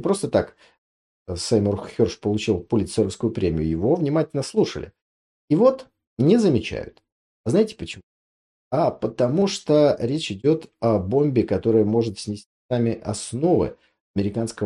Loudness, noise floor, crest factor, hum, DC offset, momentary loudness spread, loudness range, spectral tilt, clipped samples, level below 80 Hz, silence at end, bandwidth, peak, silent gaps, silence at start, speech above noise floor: -22 LUFS; under -90 dBFS; 18 dB; none; under 0.1%; 14 LU; 3 LU; -6.5 dB/octave; under 0.1%; -52 dBFS; 0 s; 11.5 kHz; -6 dBFS; 0.78-1.26 s, 5.02-5.48 s, 6.07-6.17 s, 7.12-7.44 s, 8.03-8.71 s, 12.46-12.69 s, 14.01-14.14 s; 0 s; over 69 dB